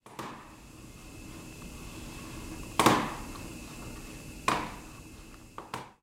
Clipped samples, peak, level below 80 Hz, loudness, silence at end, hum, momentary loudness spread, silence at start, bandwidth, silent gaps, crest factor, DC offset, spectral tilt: under 0.1%; -10 dBFS; -50 dBFS; -33 LUFS; 0.1 s; none; 23 LU; 0.05 s; 16 kHz; none; 26 dB; under 0.1%; -4 dB/octave